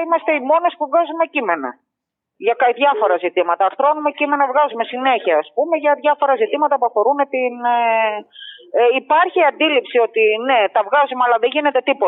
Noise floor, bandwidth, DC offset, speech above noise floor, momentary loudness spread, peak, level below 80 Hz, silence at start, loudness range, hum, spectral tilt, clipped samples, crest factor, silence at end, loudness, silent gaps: -80 dBFS; 4 kHz; under 0.1%; 64 dB; 5 LU; -2 dBFS; -86 dBFS; 0 s; 2 LU; none; 1 dB/octave; under 0.1%; 14 dB; 0 s; -16 LUFS; none